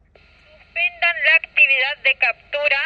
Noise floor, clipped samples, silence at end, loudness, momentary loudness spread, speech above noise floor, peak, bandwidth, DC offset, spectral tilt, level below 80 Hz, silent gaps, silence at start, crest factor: -52 dBFS; under 0.1%; 0 s; -16 LUFS; 8 LU; 32 dB; -2 dBFS; 6.8 kHz; under 0.1%; -1.5 dB/octave; -58 dBFS; none; 0.75 s; 18 dB